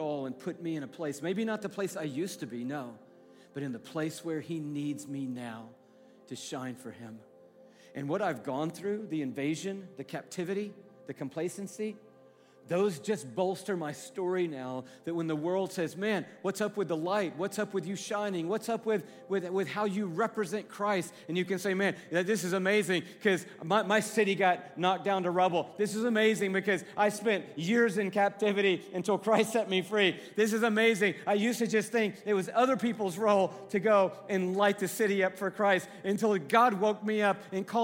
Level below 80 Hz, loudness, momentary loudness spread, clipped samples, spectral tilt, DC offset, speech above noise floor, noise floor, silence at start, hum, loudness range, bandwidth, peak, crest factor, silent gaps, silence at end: -82 dBFS; -31 LUFS; 12 LU; under 0.1%; -5 dB/octave; under 0.1%; 28 dB; -59 dBFS; 0 s; none; 10 LU; 16.5 kHz; -12 dBFS; 20 dB; none; 0 s